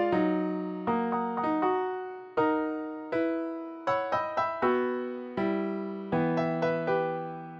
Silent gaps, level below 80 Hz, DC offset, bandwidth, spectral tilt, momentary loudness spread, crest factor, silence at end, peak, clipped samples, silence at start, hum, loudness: none; -66 dBFS; under 0.1%; 6.6 kHz; -8.5 dB/octave; 7 LU; 14 dB; 0 s; -14 dBFS; under 0.1%; 0 s; none; -30 LUFS